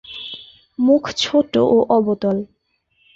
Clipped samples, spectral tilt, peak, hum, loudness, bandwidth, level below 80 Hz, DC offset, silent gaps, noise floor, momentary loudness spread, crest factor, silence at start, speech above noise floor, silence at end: under 0.1%; -5.5 dB/octave; -2 dBFS; none; -17 LUFS; 8 kHz; -56 dBFS; under 0.1%; none; -65 dBFS; 19 LU; 16 dB; 0.1 s; 49 dB; 0.7 s